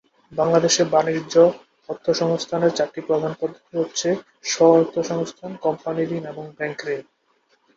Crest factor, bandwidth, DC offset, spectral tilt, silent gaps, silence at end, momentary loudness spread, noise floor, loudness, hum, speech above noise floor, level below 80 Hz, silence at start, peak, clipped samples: 20 dB; 7.8 kHz; under 0.1%; -4.5 dB/octave; none; 0.75 s; 13 LU; -64 dBFS; -21 LUFS; none; 43 dB; -64 dBFS; 0.3 s; -2 dBFS; under 0.1%